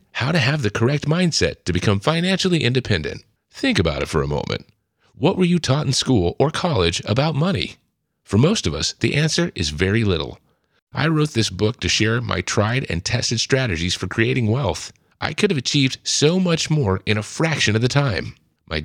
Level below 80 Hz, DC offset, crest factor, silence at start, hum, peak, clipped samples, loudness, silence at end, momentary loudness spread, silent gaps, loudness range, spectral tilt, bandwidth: -44 dBFS; under 0.1%; 20 dB; 0.15 s; none; 0 dBFS; under 0.1%; -20 LUFS; 0 s; 7 LU; 10.82-10.87 s; 2 LU; -4.5 dB/octave; 14 kHz